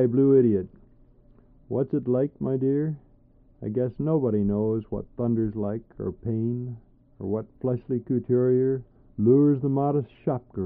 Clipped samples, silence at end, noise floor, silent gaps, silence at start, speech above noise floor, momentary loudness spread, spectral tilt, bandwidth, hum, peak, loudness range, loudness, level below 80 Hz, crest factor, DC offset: under 0.1%; 0 s; -57 dBFS; none; 0 s; 32 dB; 14 LU; -12.5 dB/octave; 3.4 kHz; none; -8 dBFS; 5 LU; -25 LUFS; -54 dBFS; 16 dB; under 0.1%